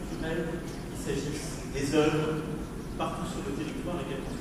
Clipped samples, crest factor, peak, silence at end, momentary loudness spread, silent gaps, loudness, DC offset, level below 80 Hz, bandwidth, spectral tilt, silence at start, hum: under 0.1%; 18 dB; -14 dBFS; 0 s; 11 LU; none; -32 LUFS; under 0.1%; -44 dBFS; 15.5 kHz; -5.5 dB/octave; 0 s; none